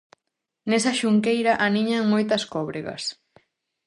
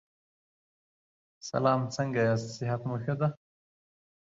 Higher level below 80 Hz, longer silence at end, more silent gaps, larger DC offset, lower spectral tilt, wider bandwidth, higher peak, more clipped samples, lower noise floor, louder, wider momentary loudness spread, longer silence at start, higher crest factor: about the same, -66 dBFS vs -68 dBFS; about the same, 0.75 s vs 0.85 s; neither; neither; second, -4.5 dB/octave vs -6.5 dB/octave; first, 11 kHz vs 7.8 kHz; first, -6 dBFS vs -12 dBFS; neither; second, -82 dBFS vs under -90 dBFS; first, -23 LUFS vs -30 LUFS; first, 10 LU vs 6 LU; second, 0.65 s vs 1.45 s; about the same, 18 dB vs 20 dB